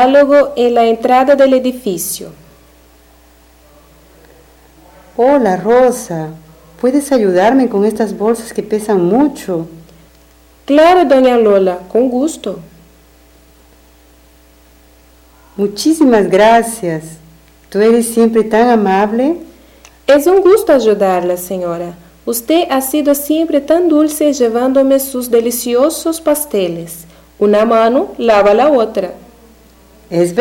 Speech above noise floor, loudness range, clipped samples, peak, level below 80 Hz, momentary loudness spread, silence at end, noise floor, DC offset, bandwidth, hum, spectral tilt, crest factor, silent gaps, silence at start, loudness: 34 dB; 7 LU; under 0.1%; -2 dBFS; -46 dBFS; 13 LU; 0 s; -45 dBFS; under 0.1%; 17.5 kHz; none; -5 dB/octave; 10 dB; none; 0 s; -12 LUFS